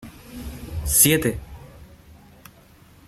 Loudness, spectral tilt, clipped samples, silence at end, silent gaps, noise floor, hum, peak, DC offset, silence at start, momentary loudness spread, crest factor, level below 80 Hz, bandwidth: -18 LUFS; -3 dB/octave; under 0.1%; 1.25 s; none; -51 dBFS; none; -2 dBFS; under 0.1%; 0 s; 25 LU; 24 dB; -40 dBFS; 16 kHz